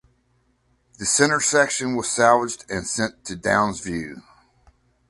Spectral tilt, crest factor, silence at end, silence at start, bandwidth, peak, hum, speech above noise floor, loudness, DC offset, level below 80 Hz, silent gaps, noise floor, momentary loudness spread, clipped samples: -3 dB/octave; 22 dB; 0.9 s; 1 s; 11.5 kHz; -2 dBFS; none; 44 dB; -21 LUFS; under 0.1%; -52 dBFS; none; -65 dBFS; 12 LU; under 0.1%